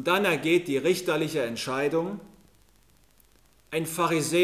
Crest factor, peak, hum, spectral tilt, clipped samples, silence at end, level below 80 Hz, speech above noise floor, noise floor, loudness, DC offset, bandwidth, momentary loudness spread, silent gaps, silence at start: 18 dB; -8 dBFS; none; -4.5 dB/octave; under 0.1%; 0 s; -66 dBFS; 36 dB; -62 dBFS; -26 LUFS; under 0.1%; 15.5 kHz; 9 LU; none; 0 s